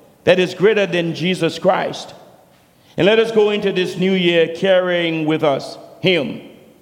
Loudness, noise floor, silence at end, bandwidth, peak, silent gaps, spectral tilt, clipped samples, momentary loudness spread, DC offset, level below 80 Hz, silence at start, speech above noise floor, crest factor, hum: -17 LUFS; -51 dBFS; 0.3 s; 16 kHz; 0 dBFS; none; -5.5 dB/octave; under 0.1%; 12 LU; under 0.1%; -62 dBFS; 0.25 s; 35 dB; 16 dB; none